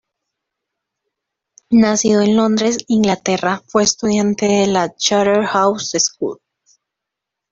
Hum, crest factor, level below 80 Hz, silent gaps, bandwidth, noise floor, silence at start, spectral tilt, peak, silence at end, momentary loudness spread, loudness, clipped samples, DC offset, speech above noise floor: none; 16 dB; -54 dBFS; none; 7.8 kHz; -82 dBFS; 1.7 s; -4 dB/octave; 0 dBFS; 1.2 s; 4 LU; -15 LUFS; under 0.1%; under 0.1%; 67 dB